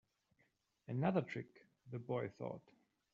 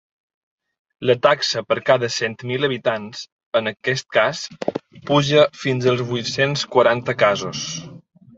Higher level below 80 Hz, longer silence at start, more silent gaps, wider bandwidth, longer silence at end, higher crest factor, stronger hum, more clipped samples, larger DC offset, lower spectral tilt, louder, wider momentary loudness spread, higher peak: second, -82 dBFS vs -60 dBFS; about the same, 0.9 s vs 1 s; second, none vs 3.32-3.39 s, 3.46-3.52 s; about the same, 7.4 kHz vs 8 kHz; first, 0.55 s vs 0.4 s; about the same, 22 dB vs 18 dB; neither; neither; neither; first, -7.5 dB/octave vs -4.5 dB/octave; second, -43 LUFS vs -20 LUFS; first, 17 LU vs 11 LU; second, -22 dBFS vs -2 dBFS